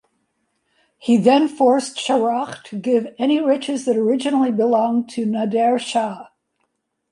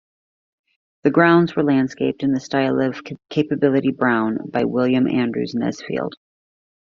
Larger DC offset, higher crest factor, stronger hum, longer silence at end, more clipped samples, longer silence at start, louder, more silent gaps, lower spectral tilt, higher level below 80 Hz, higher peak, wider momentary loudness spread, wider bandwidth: neither; about the same, 16 dB vs 18 dB; neither; about the same, 0.9 s vs 0.8 s; neither; about the same, 1.05 s vs 1.05 s; about the same, -19 LUFS vs -19 LUFS; neither; about the same, -5 dB/octave vs -5.5 dB/octave; second, -70 dBFS vs -60 dBFS; about the same, -2 dBFS vs -2 dBFS; about the same, 9 LU vs 10 LU; first, 11.5 kHz vs 7.2 kHz